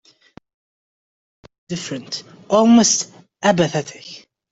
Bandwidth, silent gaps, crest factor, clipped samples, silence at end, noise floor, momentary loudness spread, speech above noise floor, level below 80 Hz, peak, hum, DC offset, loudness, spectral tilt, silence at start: 8 kHz; none; 18 dB; under 0.1%; 0.35 s; -49 dBFS; 19 LU; 31 dB; -58 dBFS; -2 dBFS; none; under 0.1%; -17 LUFS; -4 dB/octave; 1.7 s